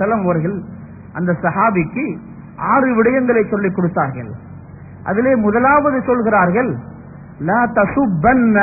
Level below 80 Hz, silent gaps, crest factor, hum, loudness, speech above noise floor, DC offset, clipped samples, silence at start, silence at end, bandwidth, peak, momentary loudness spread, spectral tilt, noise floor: -44 dBFS; none; 14 dB; none; -16 LUFS; 20 dB; under 0.1%; under 0.1%; 0 s; 0 s; 2.7 kHz; -2 dBFS; 18 LU; -16.5 dB/octave; -35 dBFS